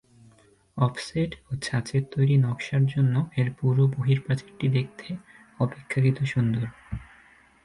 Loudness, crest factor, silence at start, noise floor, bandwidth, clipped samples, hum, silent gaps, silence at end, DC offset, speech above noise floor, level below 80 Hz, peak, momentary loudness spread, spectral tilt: -26 LUFS; 18 dB; 0.75 s; -58 dBFS; 11.5 kHz; under 0.1%; none; none; 0.6 s; under 0.1%; 33 dB; -52 dBFS; -8 dBFS; 14 LU; -7.5 dB/octave